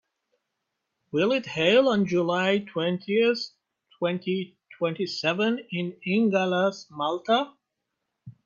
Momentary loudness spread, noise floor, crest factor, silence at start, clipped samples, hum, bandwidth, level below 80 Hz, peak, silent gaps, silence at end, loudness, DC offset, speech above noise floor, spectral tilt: 10 LU; -82 dBFS; 18 dB; 1.15 s; under 0.1%; none; 7.4 kHz; -70 dBFS; -8 dBFS; none; 0.15 s; -25 LUFS; under 0.1%; 57 dB; -6 dB/octave